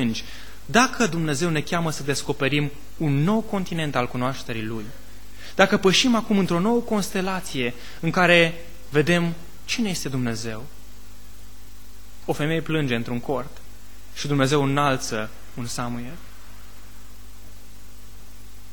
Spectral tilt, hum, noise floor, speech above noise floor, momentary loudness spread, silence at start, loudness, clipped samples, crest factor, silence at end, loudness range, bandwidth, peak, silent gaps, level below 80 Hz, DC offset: -4.5 dB/octave; 50 Hz at -45 dBFS; -45 dBFS; 22 dB; 17 LU; 0 s; -23 LUFS; under 0.1%; 24 dB; 0.05 s; 8 LU; 19 kHz; 0 dBFS; none; -46 dBFS; 3%